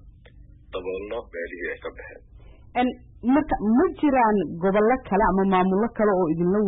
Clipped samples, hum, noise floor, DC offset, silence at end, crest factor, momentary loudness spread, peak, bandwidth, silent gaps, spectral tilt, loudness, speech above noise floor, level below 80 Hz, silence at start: under 0.1%; none; -48 dBFS; under 0.1%; 0 s; 14 dB; 14 LU; -10 dBFS; 4 kHz; none; -12 dB/octave; -23 LUFS; 26 dB; -44 dBFS; 0.05 s